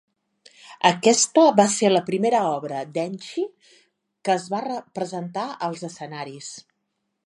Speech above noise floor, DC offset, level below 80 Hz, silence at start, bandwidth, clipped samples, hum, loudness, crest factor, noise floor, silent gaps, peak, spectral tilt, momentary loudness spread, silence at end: 54 dB; under 0.1%; -76 dBFS; 0.65 s; 11.5 kHz; under 0.1%; none; -22 LUFS; 22 dB; -77 dBFS; none; -2 dBFS; -3.5 dB/octave; 18 LU; 0.65 s